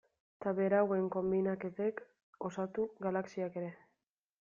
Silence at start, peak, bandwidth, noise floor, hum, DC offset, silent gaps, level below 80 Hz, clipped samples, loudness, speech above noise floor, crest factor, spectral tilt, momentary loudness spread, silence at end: 0.4 s; -18 dBFS; 7.2 kHz; -86 dBFS; none; under 0.1%; 2.23-2.33 s; -74 dBFS; under 0.1%; -36 LUFS; 51 dB; 18 dB; -8 dB/octave; 12 LU; 0.65 s